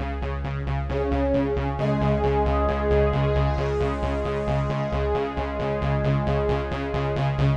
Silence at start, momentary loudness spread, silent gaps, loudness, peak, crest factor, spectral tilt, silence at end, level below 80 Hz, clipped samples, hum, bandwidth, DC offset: 0 s; 5 LU; none; -24 LUFS; -12 dBFS; 12 dB; -8.5 dB/octave; 0 s; -30 dBFS; under 0.1%; none; 7.4 kHz; under 0.1%